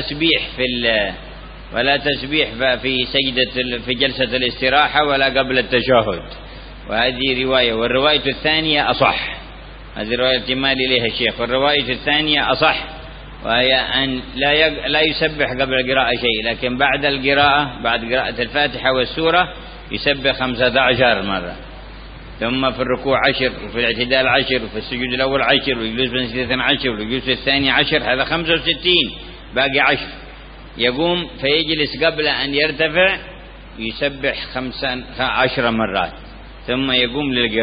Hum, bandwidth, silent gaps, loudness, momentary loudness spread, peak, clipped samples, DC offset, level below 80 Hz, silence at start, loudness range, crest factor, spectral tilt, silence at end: none; 5.2 kHz; none; -17 LUFS; 12 LU; 0 dBFS; under 0.1%; under 0.1%; -38 dBFS; 0 s; 2 LU; 18 dB; -9.5 dB/octave; 0 s